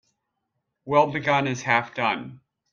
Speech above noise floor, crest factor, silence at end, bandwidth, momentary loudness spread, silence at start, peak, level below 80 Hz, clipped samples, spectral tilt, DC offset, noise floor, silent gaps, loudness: 56 dB; 22 dB; 0.35 s; 7.4 kHz; 7 LU; 0.85 s; -4 dBFS; -66 dBFS; under 0.1%; -5 dB/octave; under 0.1%; -79 dBFS; none; -23 LUFS